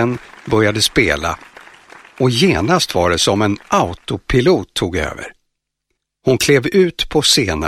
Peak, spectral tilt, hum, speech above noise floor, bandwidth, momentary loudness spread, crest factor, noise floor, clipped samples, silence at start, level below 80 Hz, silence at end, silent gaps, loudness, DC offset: 0 dBFS; -4 dB/octave; none; 58 dB; 15 kHz; 11 LU; 16 dB; -73 dBFS; under 0.1%; 0 s; -36 dBFS; 0 s; none; -15 LUFS; under 0.1%